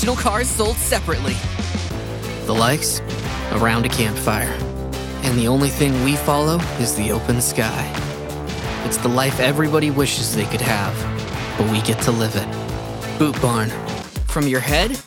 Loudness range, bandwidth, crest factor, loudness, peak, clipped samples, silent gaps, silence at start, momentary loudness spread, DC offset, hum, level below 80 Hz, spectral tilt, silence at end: 2 LU; 18 kHz; 18 dB; -20 LUFS; -2 dBFS; under 0.1%; none; 0 s; 9 LU; under 0.1%; none; -32 dBFS; -4.5 dB/octave; 0 s